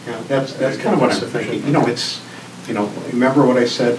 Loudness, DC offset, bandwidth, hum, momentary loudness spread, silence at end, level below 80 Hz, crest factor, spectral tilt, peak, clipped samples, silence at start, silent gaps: -18 LUFS; under 0.1%; 11 kHz; none; 10 LU; 0 s; -68 dBFS; 16 dB; -5.5 dB/octave; 0 dBFS; under 0.1%; 0 s; none